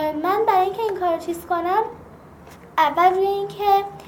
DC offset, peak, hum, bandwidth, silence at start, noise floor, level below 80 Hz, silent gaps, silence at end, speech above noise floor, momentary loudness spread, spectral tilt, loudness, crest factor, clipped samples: under 0.1%; -4 dBFS; none; 17 kHz; 0 s; -44 dBFS; -54 dBFS; none; 0 s; 23 dB; 8 LU; -5 dB/octave; -21 LUFS; 18 dB; under 0.1%